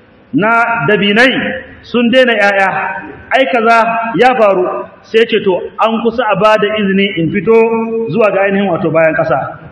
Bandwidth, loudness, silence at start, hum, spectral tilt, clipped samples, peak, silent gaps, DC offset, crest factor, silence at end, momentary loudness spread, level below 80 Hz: 12 kHz; -11 LUFS; 0.35 s; none; -6 dB/octave; 0.6%; 0 dBFS; none; under 0.1%; 12 dB; 0 s; 8 LU; -50 dBFS